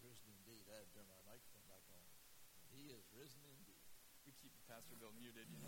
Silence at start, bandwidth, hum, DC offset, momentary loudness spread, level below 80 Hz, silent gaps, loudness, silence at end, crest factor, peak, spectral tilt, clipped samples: 0 s; 16.5 kHz; none; under 0.1%; 6 LU; -80 dBFS; none; -63 LUFS; 0 s; 18 dB; -44 dBFS; -3.5 dB/octave; under 0.1%